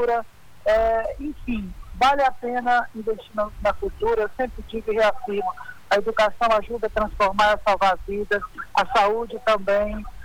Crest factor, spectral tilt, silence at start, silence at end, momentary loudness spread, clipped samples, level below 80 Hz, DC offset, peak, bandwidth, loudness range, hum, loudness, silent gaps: 14 dB; -4.5 dB/octave; 0 s; 0 s; 10 LU; under 0.1%; -40 dBFS; under 0.1%; -8 dBFS; 19 kHz; 3 LU; none; -23 LUFS; none